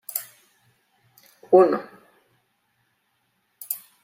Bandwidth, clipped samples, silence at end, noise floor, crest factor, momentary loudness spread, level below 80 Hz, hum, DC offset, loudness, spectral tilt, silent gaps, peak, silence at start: 16.5 kHz; under 0.1%; 0.25 s; -71 dBFS; 22 dB; 27 LU; -78 dBFS; none; under 0.1%; -21 LUFS; -5 dB/octave; none; -4 dBFS; 0.15 s